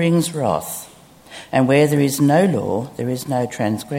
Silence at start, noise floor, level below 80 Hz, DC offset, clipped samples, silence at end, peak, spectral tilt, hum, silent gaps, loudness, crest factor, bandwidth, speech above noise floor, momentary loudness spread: 0 s; -42 dBFS; -56 dBFS; under 0.1%; under 0.1%; 0 s; 0 dBFS; -6 dB/octave; none; none; -18 LUFS; 18 dB; 17 kHz; 25 dB; 13 LU